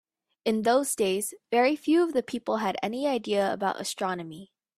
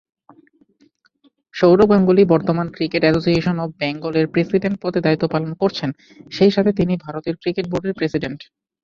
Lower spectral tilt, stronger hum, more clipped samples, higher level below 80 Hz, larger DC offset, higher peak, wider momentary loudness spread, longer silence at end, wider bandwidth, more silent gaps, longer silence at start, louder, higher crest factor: second, -4 dB/octave vs -8 dB/octave; neither; neither; second, -72 dBFS vs -48 dBFS; neither; second, -12 dBFS vs -2 dBFS; second, 8 LU vs 13 LU; about the same, 0.35 s vs 0.4 s; first, 15.5 kHz vs 7.2 kHz; neither; second, 0.45 s vs 1.55 s; second, -27 LUFS vs -18 LUFS; about the same, 16 dB vs 16 dB